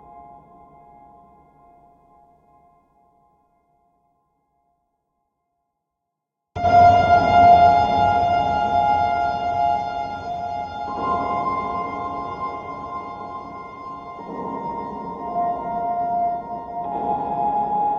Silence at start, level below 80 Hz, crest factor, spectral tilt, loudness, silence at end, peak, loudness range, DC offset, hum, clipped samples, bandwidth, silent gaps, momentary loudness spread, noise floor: 0.1 s; -48 dBFS; 20 dB; -6.5 dB/octave; -20 LUFS; 0 s; -2 dBFS; 14 LU; under 0.1%; none; under 0.1%; 7 kHz; none; 19 LU; -81 dBFS